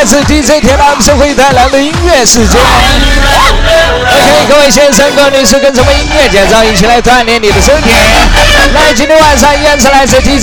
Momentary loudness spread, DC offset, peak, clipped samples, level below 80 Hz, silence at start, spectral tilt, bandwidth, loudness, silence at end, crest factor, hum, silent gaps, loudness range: 2 LU; under 0.1%; 0 dBFS; 1%; -14 dBFS; 0 s; -3 dB/octave; over 20 kHz; -4 LUFS; 0 s; 4 dB; none; none; 1 LU